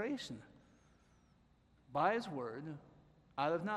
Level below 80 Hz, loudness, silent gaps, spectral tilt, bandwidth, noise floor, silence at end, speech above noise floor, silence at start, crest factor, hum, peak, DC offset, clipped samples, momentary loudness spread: -74 dBFS; -40 LUFS; none; -6 dB/octave; 13 kHz; -70 dBFS; 0 s; 31 dB; 0 s; 22 dB; none; -20 dBFS; under 0.1%; under 0.1%; 16 LU